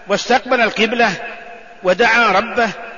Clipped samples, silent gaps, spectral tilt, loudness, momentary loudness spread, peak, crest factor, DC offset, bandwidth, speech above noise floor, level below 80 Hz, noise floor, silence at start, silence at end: under 0.1%; none; -3.5 dB/octave; -15 LUFS; 13 LU; -2 dBFS; 14 dB; 0.6%; 7.4 kHz; 20 dB; -50 dBFS; -35 dBFS; 0.05 s; 0 s